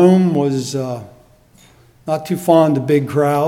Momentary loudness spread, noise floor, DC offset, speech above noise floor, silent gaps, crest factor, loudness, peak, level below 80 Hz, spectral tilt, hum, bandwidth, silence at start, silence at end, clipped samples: 13 LU; -49 dBFS; under 0.1%; 34 dB; none; 16 dB; -16 LUFS; 0 dBFS; -56 dBFS; -7 dB/octave; none; 16 kHz; 0 s; 0 s; under 0.1%